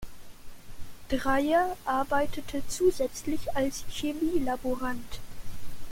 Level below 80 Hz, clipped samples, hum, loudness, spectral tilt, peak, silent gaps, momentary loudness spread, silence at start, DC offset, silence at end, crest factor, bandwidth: -44 dBFS; under 0.1%; none; -29 LUFS; -4.5 dB/octave; -12 dBFS; none; 21 LU; 0 s; under 0.1%; 0 s; 16 dB; 16.5 kHz